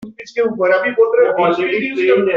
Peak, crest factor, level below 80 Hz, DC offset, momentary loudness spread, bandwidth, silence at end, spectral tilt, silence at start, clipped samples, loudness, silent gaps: -2 dBFS; 12 dB; -60 dBFS; under 0.1%; 6 LU; 7 kHz; 0 s; -6 dB/octave; 0 s; under 0.1%; -15 LUFS; none